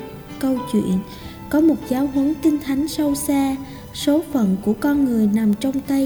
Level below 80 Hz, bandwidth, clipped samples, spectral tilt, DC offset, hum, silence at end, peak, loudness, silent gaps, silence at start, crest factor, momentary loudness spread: -44 dBFS; over 20 kHz; under 0.1%; -6 dB/octave; under 0.1%; none; 0 s; -6 dBFS; -20 LUFS; none; 0 s; 14 dB; 7 LU